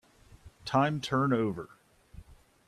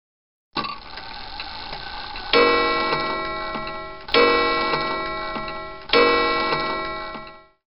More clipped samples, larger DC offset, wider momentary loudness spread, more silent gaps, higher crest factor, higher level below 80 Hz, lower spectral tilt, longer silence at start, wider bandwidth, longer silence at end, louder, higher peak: neither; second, under 0.1% vs 0.8%; about the same, 16 LU vs 17 LU; neither; about the same, 20 dB vs 22 dB; second, -60 dBFS vs -44 dBFS; first, -6.5 dB/octave vs -0.5 dB/octave; about the same, 0.45 s vs 0.5 s; first, 13 kHz vs 5.6 kHz; first, 0.35 s vs 0 s; second, -29 LUFS vs -21 LUFS; second, -14 dBFS vs 0 dBFS